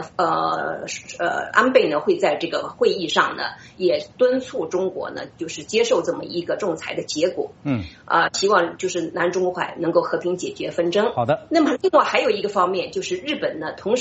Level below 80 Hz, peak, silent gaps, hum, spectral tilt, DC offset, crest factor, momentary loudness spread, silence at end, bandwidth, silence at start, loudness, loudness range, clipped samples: -58 dBFS; 0 dBFS; none; none; -3 dB/octave; under 0.1%; 20 dB; 9 LU; 0 s; 8 kHz; 0 s; -21 LUFS; 3 LU; under 0.1%